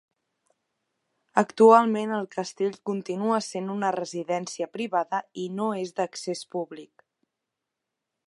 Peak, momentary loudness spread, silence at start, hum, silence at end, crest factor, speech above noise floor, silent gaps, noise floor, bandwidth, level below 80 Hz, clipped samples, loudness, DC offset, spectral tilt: -2 dBFS; 15 LU; 1.35 s; none; 1.45 s; 24 dB; 60 dB; none; -85 dBFS; 11.5 kHz; -82 dBFS; under 0.1%; -26 LUFS; under 0.1%; -5 dB/octave